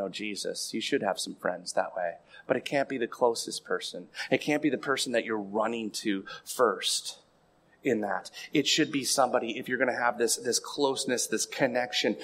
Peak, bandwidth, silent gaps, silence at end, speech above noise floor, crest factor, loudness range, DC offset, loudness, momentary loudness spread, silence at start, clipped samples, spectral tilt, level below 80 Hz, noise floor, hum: -10 dBFS; 16 kHz; none; 0 s; 35 dB; 20 dB; 4 LU; under 0.1%; -29 LUFS; 8 LU; 0 s; under 0.1%; -2.5 dB/octave; -76 dBFS; -64 dBFS; none